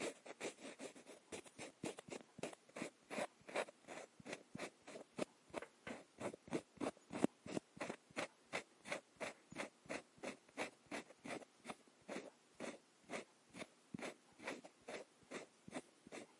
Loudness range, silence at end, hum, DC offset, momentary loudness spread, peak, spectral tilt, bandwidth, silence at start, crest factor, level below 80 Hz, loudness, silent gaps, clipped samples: 6 LU; 0 s; none; under 0.1%; 9 LU; -18 dBFS; -4 dB/octave; 11.5 kHz; 0 s; 32 dB; -86 dBFS; -51 LUFS; none; under 0.1%